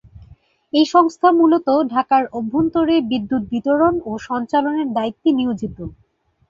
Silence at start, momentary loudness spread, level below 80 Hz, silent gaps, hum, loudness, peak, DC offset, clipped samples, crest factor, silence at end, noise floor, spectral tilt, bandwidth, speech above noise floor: 0.15 s; 10 LU; -50 dBFS; none; none; -18 LUFS; -2 dBFS; under 0.1%; under 0.1%; 16 dB; 0.55 s; -49 dBFS; -6 dB/octave; 7.4 kHz; 31 dB